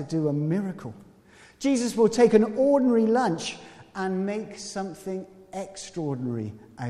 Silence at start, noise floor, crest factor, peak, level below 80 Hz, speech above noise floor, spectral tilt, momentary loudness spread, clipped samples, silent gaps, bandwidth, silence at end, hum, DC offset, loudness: 0 s; -54 dBFS; 20 dB; -6 dBFS; -62 dBFS; 29 dB; -6 dB/octave; 18 LU; under 0.1%; none; 13 kHz; 0 s; none; under 0.1%; -25 LUFS